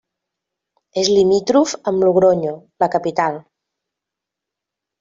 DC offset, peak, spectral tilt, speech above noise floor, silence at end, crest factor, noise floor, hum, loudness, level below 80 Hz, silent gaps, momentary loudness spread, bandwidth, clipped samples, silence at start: under 0.1%; -2 dBFS; -5 dB/octave; 68 dB; 1.6 s; 18 dB; -84 dBFS; none; -17 LUFS; -58 dBFS; none; 10 LU; 7.6 kHz; under 0.1%; 0.95 s